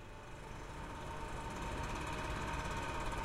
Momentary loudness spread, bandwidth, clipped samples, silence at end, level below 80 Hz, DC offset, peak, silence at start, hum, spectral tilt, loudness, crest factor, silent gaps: 9 LU; 16 kHz; under 0.1%; 0 s; -48 dBFS; under 0.1%; -28 dBFS; 0 s; none; -4.5 dB/octave; -43 LUFS; 14 dB; none